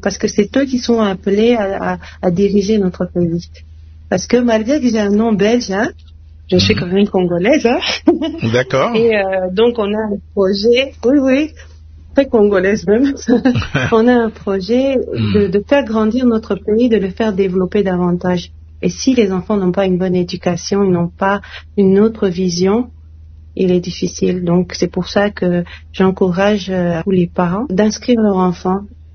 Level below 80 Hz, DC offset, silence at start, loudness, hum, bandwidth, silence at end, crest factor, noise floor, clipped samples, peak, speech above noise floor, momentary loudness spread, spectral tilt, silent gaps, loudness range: -40 dBFS; under 0.1%; 0 s; -15 LUFS; none; 6.6 kHz; 0.1 s; 14 dB; -37 dBFS; under 0.1%; 0 dBFS; 23 dB; 6 LU; -6 dB/octave; none; 2 LU